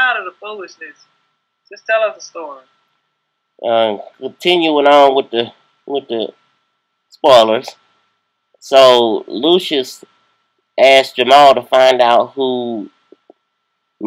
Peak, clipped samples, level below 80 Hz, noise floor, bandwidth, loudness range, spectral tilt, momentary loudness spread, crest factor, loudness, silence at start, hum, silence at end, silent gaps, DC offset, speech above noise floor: 0 dBFS; 0.2%; -64 dBFS; -70 dBFS; 15.5 kHz; 9 LU; -3.5 dB/octave; 21 LU; 14 dB; -12 LUFS; 0 s; none; 0 s; none; under 0.1%; 58 dB